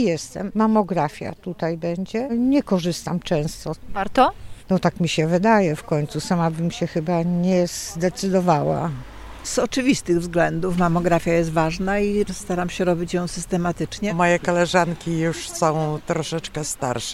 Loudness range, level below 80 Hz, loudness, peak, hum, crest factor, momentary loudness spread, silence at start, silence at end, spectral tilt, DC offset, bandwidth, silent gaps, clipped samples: 2 LU; -44 dBFS; -22 LUFS; -4 dBFS; none; 18 dB; 8 LU; 0 s; 0 s; -5.5 dB/octave; under 0.1%; 15 kHz; none; under 0.1%